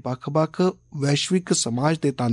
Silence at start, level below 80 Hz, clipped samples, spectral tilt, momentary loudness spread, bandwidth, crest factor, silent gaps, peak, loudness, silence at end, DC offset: 0.05 s; -62 dBFS; under 0.1%; -5 dB/octave; 3 LU; 11 kHz; 16 dB; none; -8 dBFS; -23 LUFS; 0 s; under 0.1%